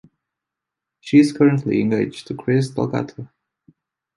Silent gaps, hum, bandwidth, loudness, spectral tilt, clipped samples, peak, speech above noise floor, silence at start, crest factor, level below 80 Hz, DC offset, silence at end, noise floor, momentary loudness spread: none; none; 11.5 kHz; -19 LUFS; -7.5 dB/octave; under 0.1%; -2 dBFS; 66 dB; 1.05 s; 18 dB; -58 dBFS; under 0.1%; 0.9 s; -84 dBFS; 15 LU